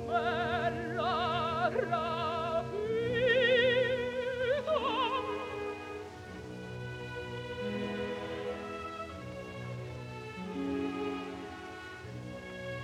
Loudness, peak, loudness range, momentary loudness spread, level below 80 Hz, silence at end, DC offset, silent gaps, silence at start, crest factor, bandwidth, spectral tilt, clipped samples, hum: -34 LUFS; -16 dBFS; 10 LU; 15 LU; -58 dBFS; 0 s; under 0.1%; none; 0 s; 18 dB; 12.5 kHz; -5.5 dB/octave; under 0.1%; none